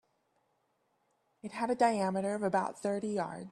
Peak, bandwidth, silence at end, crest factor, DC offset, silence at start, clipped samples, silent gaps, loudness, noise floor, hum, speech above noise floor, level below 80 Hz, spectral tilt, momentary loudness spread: -16 dBFS; 12 kHz; 0 s; 20 dB; under 0.1%; 1.45 s; under 0.1%; none; -33 LUFS; -77 dBFS; none; 44 dB; -76 dBFS; -6 dB/octave; 9 LU